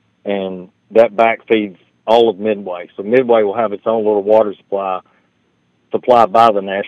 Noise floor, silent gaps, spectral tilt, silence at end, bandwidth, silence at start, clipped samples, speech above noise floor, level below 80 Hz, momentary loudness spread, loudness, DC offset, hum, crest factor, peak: -60 dBFS; none; -6.5 dB/octave; 0 s; 8.4 kHz; 0.25 s; 0.2%; 46 dB; -62 dBFS; 15 LU; -14 LUFS; under 0.1%; none; 14 dB; 0 dBFS